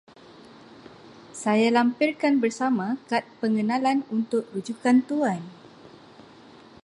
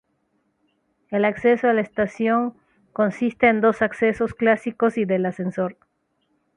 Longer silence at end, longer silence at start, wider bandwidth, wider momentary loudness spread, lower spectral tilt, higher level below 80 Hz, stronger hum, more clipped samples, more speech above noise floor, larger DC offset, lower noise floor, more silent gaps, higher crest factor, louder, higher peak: about the same, 0.95 s vs 0.85 s; about the same, 1.05 s vs 1.1 s; about the same, 11 kHz vs 10 kHz; about the same, 9 LU vs 9 LU; second, -5.5 dB/octave vs -7.5 dB/octave; second, -74 dBFS vs -58 dBFS; neither; neither; second, 26 dB vs 49 dB; neither; second, -49 dBFS vs -70 dBFS; neither; about the same, 18 dB vs 18 dB; second, -24 LUFS vs -21 LUFS; about the same, -6 dBFS vs -4 dBFS